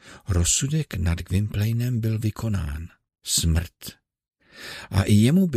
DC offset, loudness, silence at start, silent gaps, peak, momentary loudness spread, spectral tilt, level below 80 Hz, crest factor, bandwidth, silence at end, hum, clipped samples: under 0.1%; -23 LUFS; 0.05 s; none; -6 dBFS; 18 LU; -5 dB/octave; -36 dBFS; 18 dB; 15.5 kHz; 0 s; none; under 0.1%